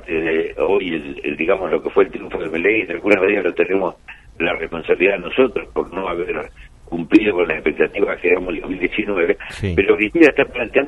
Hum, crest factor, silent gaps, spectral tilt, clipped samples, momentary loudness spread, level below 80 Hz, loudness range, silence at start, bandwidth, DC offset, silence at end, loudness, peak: none; 18 dB; none; -6.5 dB/octave; under 0.1%; 10 LU; -42 dBFS; 2 LU; 0.05 s; 10.5 kHz; under 0.1%; 0 s; -18 LUFS; 0 dBFS